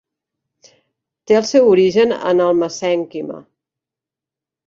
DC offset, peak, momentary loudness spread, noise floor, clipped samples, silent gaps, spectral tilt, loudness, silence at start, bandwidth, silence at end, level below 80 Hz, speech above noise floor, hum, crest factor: under 0.1%; -2 dBFS; 16 LU; -87 dBFS; under 0.1%; none; -5 dB/octave; -15 LUFS; 1.3 s; 7.6 kHz; 1.3 s; -62 dBFS; 73 dB; none; 16 dB